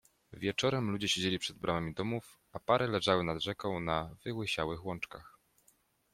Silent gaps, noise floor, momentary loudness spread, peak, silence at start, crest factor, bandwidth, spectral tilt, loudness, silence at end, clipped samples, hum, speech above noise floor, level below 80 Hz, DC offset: none; -71 dBFS; 11 LU; -14 dBFS; 0.3 s; 22 dB; 16 kHz; -4.5 dB/octave; -34 LUFS; 0.85 s; under 0.1%; none; 37 dB; -62 dBFS; under 0.1%